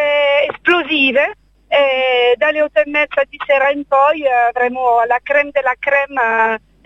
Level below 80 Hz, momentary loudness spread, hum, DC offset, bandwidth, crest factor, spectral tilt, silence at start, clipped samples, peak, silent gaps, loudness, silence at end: -54 dBFS; 4 LU; none; under 0.1%; 7.4 kHz; 14 dB; -4 dB/octave; 0 s; under 0.1%; 0 dBFS; none; -14 LUFS; 0.3 s